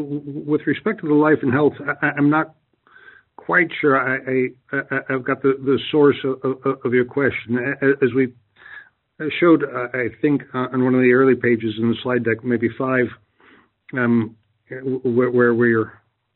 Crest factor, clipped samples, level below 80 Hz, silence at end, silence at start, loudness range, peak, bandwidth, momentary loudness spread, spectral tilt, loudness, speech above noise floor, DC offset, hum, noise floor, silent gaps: 16 dB; under 0.1%; -62 dBFS; 0.45 s; 0 s; 3 LU; -2 dBFS; 4.2 kHz; 9 LU; -5.5 dB/octave; -19 LUFS; 34 dB; under 0.1%; none; -53 dBFS; none